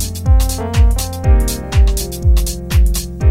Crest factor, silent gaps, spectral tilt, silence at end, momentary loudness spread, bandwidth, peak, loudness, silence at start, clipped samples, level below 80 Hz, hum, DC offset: 12 dB; none; -5 dB/octave; 0 s; 3 LU; 16.5 kHz; 0 dBFS; -15 LUFS; 0 s; under 0.1%; -14 dBFS; none; under 0.1%